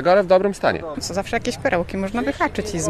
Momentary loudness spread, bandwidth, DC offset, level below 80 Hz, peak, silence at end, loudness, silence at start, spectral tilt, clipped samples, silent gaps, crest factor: 9 LU; 14 kHz; under 0.1%; -42 dBFS; -4 dBFS; 0 s; -21 LUFS; 0 s; -4.5 dB/octave; under 0.1%; none; 16 dB